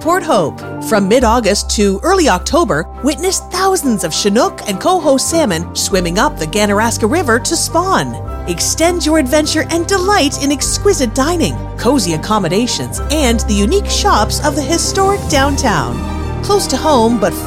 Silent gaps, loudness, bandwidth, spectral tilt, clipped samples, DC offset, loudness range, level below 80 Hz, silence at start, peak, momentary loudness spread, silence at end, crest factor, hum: none; -13 LUFS; 16.5 kHz; -4 dB/octave; under 0.1%; under 0.1%; 1 LU; -26 dBFS; 0 s; 0 dBFS; 5 LU; 0 s; 14 dB; none